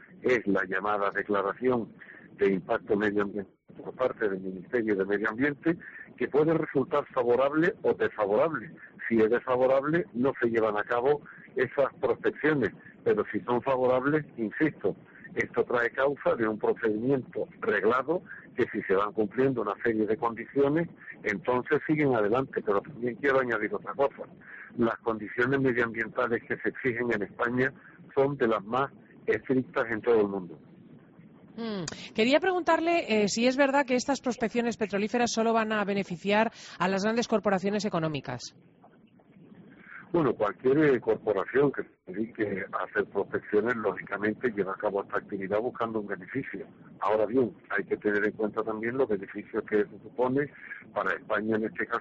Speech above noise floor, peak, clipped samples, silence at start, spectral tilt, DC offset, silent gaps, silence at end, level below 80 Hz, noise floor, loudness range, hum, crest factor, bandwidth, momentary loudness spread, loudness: 30 dB; -10 dBFS; under 0.1%; 0.1 s; -4.5 dB/octave; under 0.1%; none; 0 s; -64 dBFS; -58 dBFS; 4 LU; none; 18 dB; 8 kHz; 10 LU; -28 LUFS